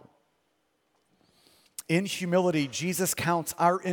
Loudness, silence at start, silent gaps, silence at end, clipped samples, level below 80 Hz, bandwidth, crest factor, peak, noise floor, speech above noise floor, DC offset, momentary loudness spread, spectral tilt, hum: -27 LUFS; 1.8 s; none; 0 s; under 0.1%; -68 dBFS; 18 kHz; 20 dB; -10 dBFS; -73 dBFS; 47 dB; under 0.1%; 4 LU; -4.5 dB/octave; none